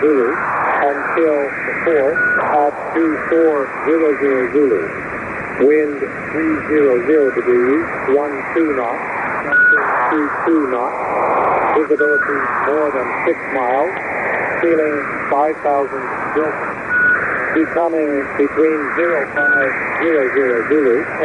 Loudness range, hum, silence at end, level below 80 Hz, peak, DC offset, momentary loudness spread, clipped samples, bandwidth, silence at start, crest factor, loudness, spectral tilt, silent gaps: 2 LU; none; 0 s; -50 dBFS; -4 dBFS; under 0.1%; 6 LU; under 0.1%; 10 kHz; 0 s; 12 dB; -16 LUFS; -7 dB/octave; none